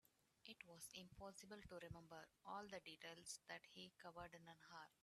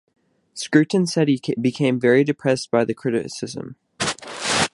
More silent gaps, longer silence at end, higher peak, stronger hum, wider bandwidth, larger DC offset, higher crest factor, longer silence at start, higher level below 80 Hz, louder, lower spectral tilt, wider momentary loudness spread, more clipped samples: neither; about the same, 0.1 s vs 0.05 s; second, -38 dBFS vs -2 dBFS; neither; first, 13.5 kHz vs 11.5 kHz; neither; about the same, 22 dB vs 20 dB; second, 0.05 s vs 0.55 s; second, -78 dBFS vs -58 dBFS; second, -59 LUFS vs -21 LUFS; second, -3 dB/octave vs -5 dB/octave; second, 7 LU vs 14 LU; neither